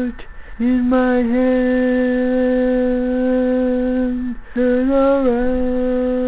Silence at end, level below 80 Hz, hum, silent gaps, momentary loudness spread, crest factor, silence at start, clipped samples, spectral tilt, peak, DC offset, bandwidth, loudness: 0 s; -36 dBFS; none; none; 5 LU; 10 dB; 0 s; under 0.1%; -10.5 dB/octave; -6 dBFS; 0.5%; 4 kHz; -17 LUFS